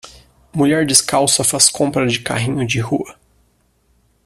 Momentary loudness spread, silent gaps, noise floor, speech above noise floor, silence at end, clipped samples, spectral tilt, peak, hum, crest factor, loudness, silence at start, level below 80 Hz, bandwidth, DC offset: 10 LU; none; -59 dBFS; 43 dB; 1.15 s; under 0.1%; -3 dB/octave; 0 dBFS; none; 18 dB; -15 LUFS; 0.05 s; -50 dBFS; 15.5 kHz; under 0.1%